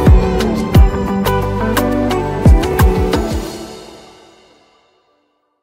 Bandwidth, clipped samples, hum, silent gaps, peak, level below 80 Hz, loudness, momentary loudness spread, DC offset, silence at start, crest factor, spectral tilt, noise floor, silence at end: 16 kHz; under 0.1%; none; none; 0 dBFS; -18 dBFS; -14 LUFS; 12 LU; under 0.1%; 0 s; 14 dB; -7 dB/octave; -62 dBFS; 1.65 s